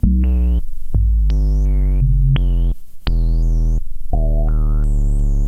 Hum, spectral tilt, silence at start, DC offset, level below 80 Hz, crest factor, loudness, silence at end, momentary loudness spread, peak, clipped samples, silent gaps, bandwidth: none; -8.5 dB/octave; 0.05 s; under 0.1%; -14 dBFS; 12 dB; -19 LUFS; 0 s; 7 LU; -2 dBFS; under 0.1%; none; 4.9 kHz